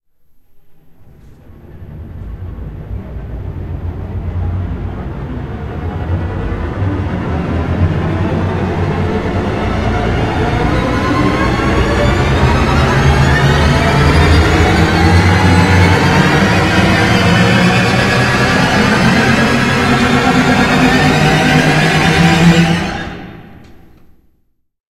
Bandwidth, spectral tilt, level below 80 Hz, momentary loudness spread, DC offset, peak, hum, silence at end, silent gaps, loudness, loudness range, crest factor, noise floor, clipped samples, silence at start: 15 kHz; -6 dB/octave; -22 dBFS; 14 LU; under 0.1%; 0 dBFS; none; 1.15 s; none; -12 LUFS; 14 LU; 12 dB; -58 dBFS; under 0.1%; 0.55 s